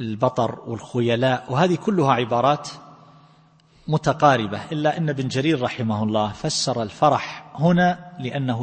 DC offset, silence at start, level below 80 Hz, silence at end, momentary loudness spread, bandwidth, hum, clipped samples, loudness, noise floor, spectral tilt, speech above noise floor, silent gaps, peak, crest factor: under 0.1%; 0 s; -56 dBFS; 0 s; 10 LU; 8.8 kHz; none; under 0.1%; -21 LUFS; -55 dBFS; -5.5 dB/octave; 34 dB; none; -2 dBFS; 20 dB